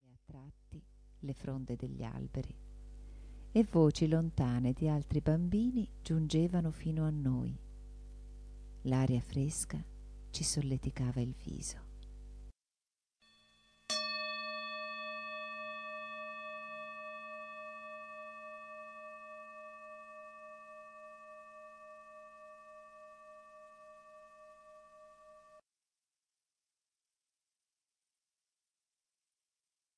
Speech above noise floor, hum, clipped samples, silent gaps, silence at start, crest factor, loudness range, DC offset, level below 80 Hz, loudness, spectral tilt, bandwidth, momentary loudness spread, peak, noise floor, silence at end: over 56 dB; none; under 0.1%; none; 0.1 s; 24 dB; 21 LU; under 0.1%; -54 dBFS; -37 LUFS; -5.5 dB/octave; 11 kHz; 23 LU; -16 dBFS; under -90 dBFS; 4.4 s